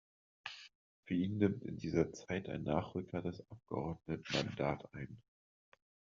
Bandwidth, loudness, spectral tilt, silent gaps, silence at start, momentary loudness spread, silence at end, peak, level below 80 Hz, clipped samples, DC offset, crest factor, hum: 7.4 kHz; -40 LUFS; -5.5 dB/octave; 0.75-1.03 s; 0.45 s; 15 LU; 1 s; -18 dBFS; -66 dBFS; under 0.1%; under 0.1%; 22 dB; none